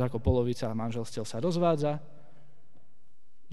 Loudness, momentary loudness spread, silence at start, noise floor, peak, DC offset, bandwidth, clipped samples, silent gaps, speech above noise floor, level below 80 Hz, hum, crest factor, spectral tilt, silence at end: -30 LUFS; 9 LU; 0 s; -72 dBFS; -12 dBFS; 1%; 12 kHz; under 0.1%; none; 42 dB; -46 dBFS; none; 20 dB; -7 dB/octave; 1.35 s